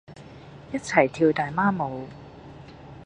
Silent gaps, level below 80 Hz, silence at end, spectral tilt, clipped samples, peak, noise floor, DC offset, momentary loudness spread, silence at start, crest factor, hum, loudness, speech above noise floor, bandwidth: none; -56 dBFS; 0 s; -6 dB/octave; under 0.1%; -2 dBFS; -45 dBFS; under 0.1%; 23 LU; 0.1 s; 24 dB; none; -24 LUFS; 21 dB; 10 kHz